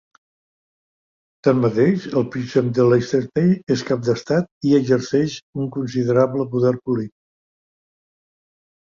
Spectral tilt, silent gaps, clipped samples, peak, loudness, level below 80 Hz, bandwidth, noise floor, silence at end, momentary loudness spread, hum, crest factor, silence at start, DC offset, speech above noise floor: -7.5 dB/octave; 4.51-4.61 s, 5.42-5.53 s; under 0.1%; -2 dBFS; -19 LUFS; -58 dBFS; 7.4 kHz; under -90 dBFS; 1.75 s; 8 LU; none; 18 dB; 1.45 s; under 0.1%; over 71 dB